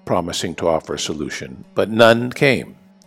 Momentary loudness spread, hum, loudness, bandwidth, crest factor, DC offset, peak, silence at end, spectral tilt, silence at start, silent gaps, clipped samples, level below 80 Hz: 14 LU; none; -18 LUFS; 16 kHz; 18 dB; under 0.1%; 0 dBFS; 0.35 s; -4.5 dB/octave; 0.05 s; none; under 0.1%; -50 dBFS